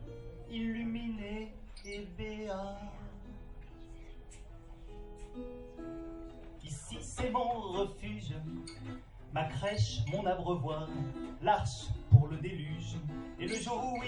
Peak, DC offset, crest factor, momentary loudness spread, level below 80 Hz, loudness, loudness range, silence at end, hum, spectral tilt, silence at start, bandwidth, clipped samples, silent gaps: -10 dBFS; under 0.1%; 26 dB; 19 LU; -48 dBFS; -36 LUFS; 17 LU; 0 s; none; -6 dB/octave; 0 s; 11.5 kHz; under 0.1%; none